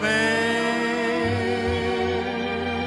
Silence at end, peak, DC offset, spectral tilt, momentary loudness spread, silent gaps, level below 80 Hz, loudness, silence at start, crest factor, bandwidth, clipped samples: 0 s; -10 dBFS; under 0.1%; -5 dB/octave; 5 LU; none; -46 dBFS; -23 LUFS; 0 s; 14 dB; 12.5 kHz; under 0.1%